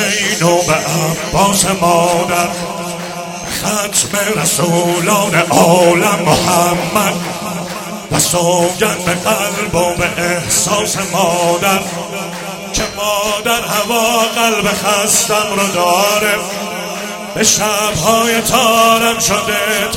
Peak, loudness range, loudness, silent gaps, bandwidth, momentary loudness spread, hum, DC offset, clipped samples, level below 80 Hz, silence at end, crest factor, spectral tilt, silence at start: 0 dBFS; 3 LU; -13 LUFS; none; 17.5 kHz; 11 LU; none; under 0.1%; under 0.1%; -42 dBFS; 0 s; 14 dB; -3 dB/octave; 0 s